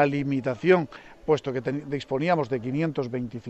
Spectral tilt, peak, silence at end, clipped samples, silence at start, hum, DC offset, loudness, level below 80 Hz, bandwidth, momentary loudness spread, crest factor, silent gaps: -7.5 dB/octave; -8 dBFS; 0 s; under 0.1%; 0 s; none; under 0.1%; -26 LUFS; -58 dBFS; 8.2 kHz; 9 LU; 18 dB; none